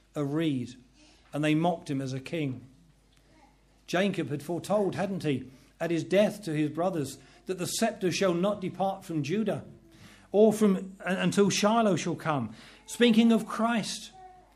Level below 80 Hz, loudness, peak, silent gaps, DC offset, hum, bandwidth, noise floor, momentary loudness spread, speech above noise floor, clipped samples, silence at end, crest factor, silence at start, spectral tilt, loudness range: -64 dBFS; -28 LUFS; -10 dBFS; none; under 0.1%; none; 14.5 kHz; -61 dBFS; 14 LU; 34 dB; under 0.1%; 0.25 s; 20 dB; 0.15 s; -5.5 dB/octave; 6 LU